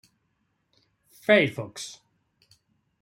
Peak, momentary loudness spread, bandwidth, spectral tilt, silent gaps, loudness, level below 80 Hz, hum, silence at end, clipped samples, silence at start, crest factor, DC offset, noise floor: -4 dBFS; 18 LU; 16.5 kHz; -4.5 dB/octave; none; -24 LUFS; -70 dBFS; none; 1.1 s; under 0.1%; 1.3 s; 24 dB; under 0.1%; -74 dBFS